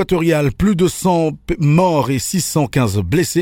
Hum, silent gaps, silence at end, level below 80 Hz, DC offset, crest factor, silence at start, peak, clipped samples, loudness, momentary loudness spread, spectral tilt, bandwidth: none; none; 0 s; -36 dBFS; under 0.1%; 14 dB; 0 s; -2 dBFS; under 0.1%; -16 LUFS; 4 LU; -6 dB/octave; 17 kHz